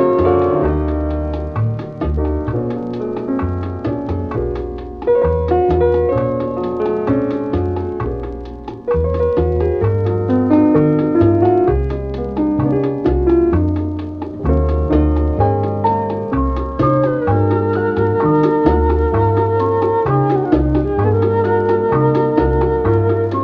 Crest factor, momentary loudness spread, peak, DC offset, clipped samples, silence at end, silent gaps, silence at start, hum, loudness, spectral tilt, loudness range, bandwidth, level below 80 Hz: 16 dB; 8 LU; 0 dBFS; under 0.1%; under 0.1%; 0 s; none; 0 s; none; -16 LUFS; -11 dB/octave; 5 LU; 5.4 kHz; -26 dBFS